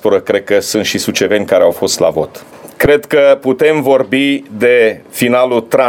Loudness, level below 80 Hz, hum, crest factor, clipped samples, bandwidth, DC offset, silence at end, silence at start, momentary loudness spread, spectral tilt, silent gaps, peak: -12 LUFS; -42 dBFS; none; 12 dB; under 0.1%; 17.5 kHz; under 0.1%; 0 s; 0.05 s; 5 LU; -4 dB/octave; none; 0 dBFS